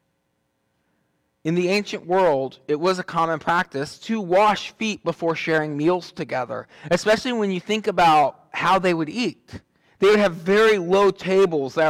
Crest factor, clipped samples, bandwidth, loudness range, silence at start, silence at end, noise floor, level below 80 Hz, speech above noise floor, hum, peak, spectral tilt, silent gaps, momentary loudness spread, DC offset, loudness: 12 dB; under 0.1%; 15 kHz; 4 LU; 1.45 s; 0 s; -72 dBFS; -58 dBFS; 51 dB; none; -10 dBFS; -5 dB/octave; none; 10 LU; under 0.1%; -21 LUFS